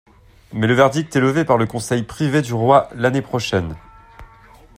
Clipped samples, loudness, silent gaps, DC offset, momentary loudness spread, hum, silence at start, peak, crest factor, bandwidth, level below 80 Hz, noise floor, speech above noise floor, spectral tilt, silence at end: under 0.1%; -18 LUFS; none; under 0.1%; 8 LU; none; 0.5 s; -2 dBFS; 18 dB; 15.5 kHz; -48 dBFS; -46 dBFS; 29 dB; -6 dB/octave; 0.55 s